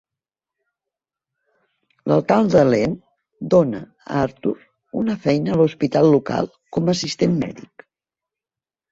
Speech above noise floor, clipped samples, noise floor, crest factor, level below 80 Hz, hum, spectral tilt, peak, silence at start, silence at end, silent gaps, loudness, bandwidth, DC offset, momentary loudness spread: over 72 dB; under 0.1%; under -90 dBFS; 18 dB; -54 dBFS; none; -7 dB/octave; -2 dBFS; 2.05 s; 1.3 s; none; -19 LUFS; 8 kHz; under 0.1%; 15 LU